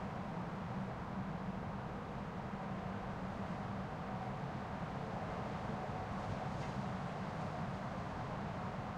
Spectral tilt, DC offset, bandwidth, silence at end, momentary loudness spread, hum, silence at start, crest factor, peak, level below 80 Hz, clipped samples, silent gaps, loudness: -7.5 dB/octave; under 0.1%; 10.5 kHz; 0 s; 2 LU; none; 0 s; 14 dB; -30 dBFS; -58 dBFS; under 0.1%; none; -43 LUFS